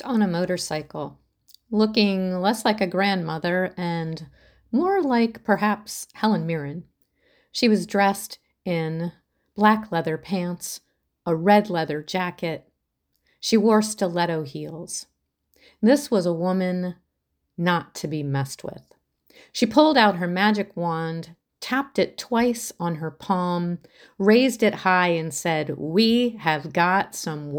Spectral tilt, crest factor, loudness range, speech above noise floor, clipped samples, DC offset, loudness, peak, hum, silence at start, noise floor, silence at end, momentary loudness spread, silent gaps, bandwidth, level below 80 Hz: -5 dB/octave; 20 dB; 4 LU; 54 dB; under 0.1%; under 0.1%; -23 LUFS; -2 dBFS; none; 0.05 s; -76 dBFS; 0 s; 15 LU; none; over 20 kHz; -62 dBFS